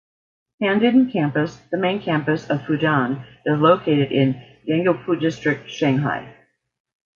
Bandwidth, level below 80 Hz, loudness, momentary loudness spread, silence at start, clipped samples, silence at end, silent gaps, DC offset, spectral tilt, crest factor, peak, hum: 7.2 kHz; -60 dBFS; -20 LUFS; 9 LU; 0.6 s; under 0.1%; 0.85 s; none; under 0.1%; -7.5 dB/octave; 18 dB; -2 dBFS; none